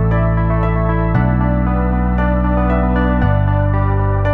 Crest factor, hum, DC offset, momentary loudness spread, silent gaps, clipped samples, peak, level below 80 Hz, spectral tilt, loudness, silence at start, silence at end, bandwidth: 12 dB; none; 0.3%; 1 LU; none; under 0.1%; -2 dBFS; -18 dBFS; -11 dB/octave; -16 LUFS; 0 s; 0 s; 4 kHz